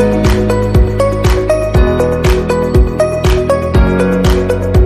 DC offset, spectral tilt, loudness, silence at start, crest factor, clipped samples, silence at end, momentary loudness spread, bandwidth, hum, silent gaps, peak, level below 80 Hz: under 0.1%; -7 dB/octave; -12 LUFS; 0 s; 10 dB; under 0.1%; 0 s; 2 LU; 14.5 kHz; none; none; 0 dBFS; -16 dBFS